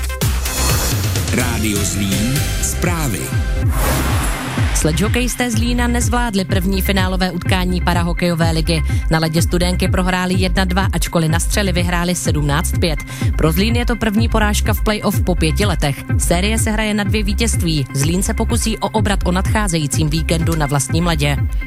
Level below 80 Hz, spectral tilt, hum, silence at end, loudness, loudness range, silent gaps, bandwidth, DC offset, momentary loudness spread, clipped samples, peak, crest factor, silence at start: -22 dBFS; -4.5 dB/octave; none; 0 s; -17 LUFS; 1 LU; none; 16.5 kHz; under 0.1%; 2 LU; under 0.1%; 0 dBFS; 14 dB; 0 s